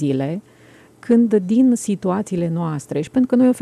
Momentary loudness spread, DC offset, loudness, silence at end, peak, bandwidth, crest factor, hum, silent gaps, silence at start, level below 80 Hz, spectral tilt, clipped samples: 10 LU; under 0.1%; -18 LUFS; 0 s; -6 dBFS; 12 kHz; 12 dB; none; none; 0 s; -60 dBFS; -7.5 dB/octave; under 0.1%